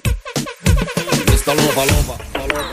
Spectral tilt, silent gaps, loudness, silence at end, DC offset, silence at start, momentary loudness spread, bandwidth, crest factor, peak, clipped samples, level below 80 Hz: -4.5 dB/octave; none; -17 LUFS; 0 s; under 0.1%; 0.05 s; 9 LU; 15.5 kHz; 16 dB; 0 dBFS; under 0.1%; -22 dBFS